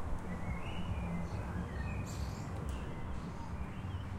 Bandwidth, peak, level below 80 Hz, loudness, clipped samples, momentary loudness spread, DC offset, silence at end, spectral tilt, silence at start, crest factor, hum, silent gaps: 16 kHz; -26 dBFS; -44 dBFS; -42 LUFS; under 0.1%; 4 LU; under 0.1%; 0 s; -6.5 dB/octave; 0 s; 14 dB; none; none